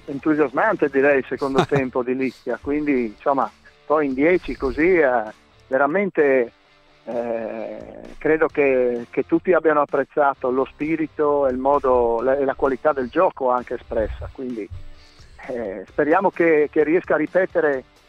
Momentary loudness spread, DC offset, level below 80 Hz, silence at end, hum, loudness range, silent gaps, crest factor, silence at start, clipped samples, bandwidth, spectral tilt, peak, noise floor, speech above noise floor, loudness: 11 LU; under 0.1%; -44 dBFS; 0.25 s; none; 3 LU; none; 16 dB; 0.05 s; under 0.1%; 8.8 kHz; -7.5 dB/octave; -4 dBFS; -54 dBFS; 34 dB; -20 LUFS